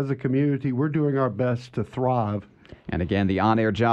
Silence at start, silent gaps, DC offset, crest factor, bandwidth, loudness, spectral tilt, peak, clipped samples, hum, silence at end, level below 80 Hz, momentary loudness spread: 0 s; none; under 0.1%; 16 dB; 8 kHz; -24 LUFS; -8.5 dB/octave; -8 dBFS; under 0.1%; none; 0 s; -50 dBFS; 9 LU